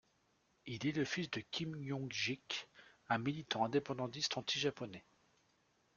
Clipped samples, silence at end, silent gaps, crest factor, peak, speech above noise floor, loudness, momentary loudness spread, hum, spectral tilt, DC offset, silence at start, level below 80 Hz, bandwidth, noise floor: under 0.1%; 0.95 s; none; 20 dB; -20 dBFS; 37 dB; -40 LUFS; 13 LU; none; -4 dB/octave; under 0.1%; 0.65 s; -76 dBFS; 7.4 kHz; -77 dBFS